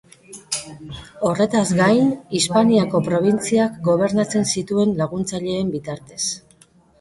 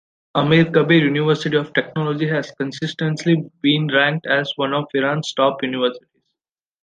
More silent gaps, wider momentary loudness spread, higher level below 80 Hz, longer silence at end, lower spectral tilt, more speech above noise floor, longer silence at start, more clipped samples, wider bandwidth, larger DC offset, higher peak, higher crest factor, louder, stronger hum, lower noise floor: neither; first, 11 LU vs 8 LU; first, -54 dBFS vs -60 dBFS; second, 0.6 s vs 0.85 s; about the same, -5 dB/octave vs -6 dB/octave; second, 34 dB vs 67 dB; about the same, 0.3 s vs 0.35 s; neither; first, 11.5 kHz vs 9.2 kHz; neither; second, -4 dBFS vs 0 dBFS; about the same, 16 dB vs 18 dB; about the same, -19 LUFS vs -19 LUFS; neither; second, -53 dBFS vs -85 dBFS